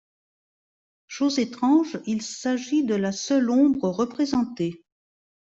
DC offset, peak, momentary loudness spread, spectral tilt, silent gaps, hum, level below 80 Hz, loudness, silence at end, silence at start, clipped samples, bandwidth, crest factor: under 0.1%; -8 dBFS; 9 LU; -5 dB/octave; none; none; -66 dBFS; -24 LUFS; 0.75 s; 1.1 s; under 0.1%; 8 kHz; 16 dB